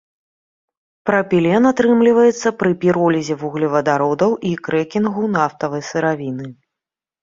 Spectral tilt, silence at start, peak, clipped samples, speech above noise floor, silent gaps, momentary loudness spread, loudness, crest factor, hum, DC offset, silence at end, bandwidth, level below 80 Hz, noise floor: -6.5 dB/octave; 1.05 s; -2 dBFS; under 0.1%; 70 dB; none; 10 LU; -17 LUFS; 16 dB; none; under 0.1%; 0.7 s; 7.6 kHz; -58 dBFS; -86 dBFS